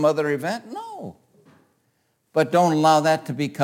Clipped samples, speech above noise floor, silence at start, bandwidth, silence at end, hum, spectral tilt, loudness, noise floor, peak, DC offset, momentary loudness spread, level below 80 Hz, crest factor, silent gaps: under 0.1%; 49 dB; 0 s; 17 kHz; 0 s; none; -5.5 dB/octave; -21 LUFS; -69 dBFS; -6 dBFS; under 0.1%; 19 LU; -72 dBFS; 16 dB; none